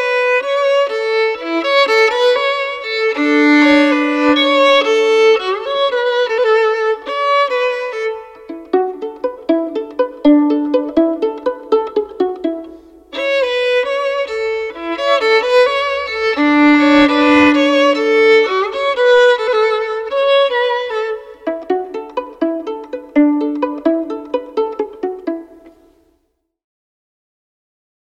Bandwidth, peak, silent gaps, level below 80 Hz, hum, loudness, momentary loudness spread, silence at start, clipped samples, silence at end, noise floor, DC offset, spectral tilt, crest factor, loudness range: 9.4 kHz; -2 dBFS; none; -52 dBFS; none; -14 LUFS; 13 LU; 0 s; under 0.1%; 2.4 s; -65 dBFS; under 0.1%; -3.5 dB/octave; 14 dB; 7 LU